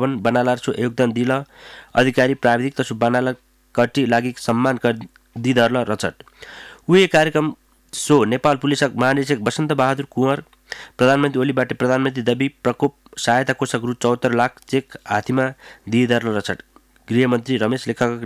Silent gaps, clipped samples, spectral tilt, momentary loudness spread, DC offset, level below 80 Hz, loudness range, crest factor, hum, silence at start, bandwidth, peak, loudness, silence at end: none; under 0.1%; -5.5 dB/octave; 10 LU; under 0.1%; -56 dBFS; 3 LU; 14 dB; none; 0 s; 15.5 kHz; -4 dBFS; -19 LUFS; 0 s